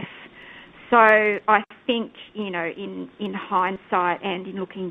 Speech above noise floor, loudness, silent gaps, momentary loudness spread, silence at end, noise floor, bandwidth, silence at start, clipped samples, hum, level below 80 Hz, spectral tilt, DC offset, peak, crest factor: 23 dB; -22 LUFS; none; 19 LU; 0 s; -45 dBFS; 5 kHz; 0 s; under 0.1%; none; -64 dBFS; -7 dB/octave; under 0.1%; 0 dBFS; 22 dB